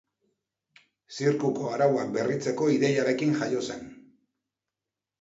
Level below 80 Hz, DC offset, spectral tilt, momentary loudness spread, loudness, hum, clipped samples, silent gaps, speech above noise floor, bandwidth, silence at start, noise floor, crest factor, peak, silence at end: -72 dBFS; under 0.1%; -6 dB/octave; 12 LU; -26 LUFS; none; under 0.1%; none; 63 dB; 8 kHz; 1.1 s; -89 dBFS; 18 dB; -12 dBFS; 1.25 s